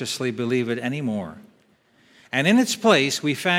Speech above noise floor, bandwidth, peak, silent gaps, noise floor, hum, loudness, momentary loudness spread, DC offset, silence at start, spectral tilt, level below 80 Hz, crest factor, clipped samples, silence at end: 38 dB; 16.5 kHz; -2 dBFS; none; -60 dBFS; none; -22 LUFS; 10 LU; under 0.1%; 0 s; -4 dB/octave; -68 dBFS; 20 dB; under 0.1%; 0 s